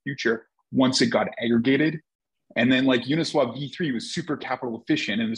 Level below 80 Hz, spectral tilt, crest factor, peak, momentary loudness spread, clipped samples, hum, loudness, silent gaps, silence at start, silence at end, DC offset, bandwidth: -68 dBFS; -5 dB/octave; 16 dB; -8 dBFS; 9 LU; under 0.1%; none; -24 LUFS; 2.15-2.19 s; 0.05 s; 0 s; under 0.1%; 10.5 kHz